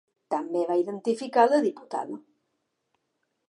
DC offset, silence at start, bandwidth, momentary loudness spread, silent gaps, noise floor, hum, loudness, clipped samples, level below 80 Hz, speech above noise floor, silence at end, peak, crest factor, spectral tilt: under 0.1%; 0.3 s; 11 kHz; 13 LU; none; -78 dBFS; none; -26 LUFS; under 0.1%; -86 dBFS; 53 dB; 1.3 s; -6 dBFS; 20 dB; -5.5 dB/octave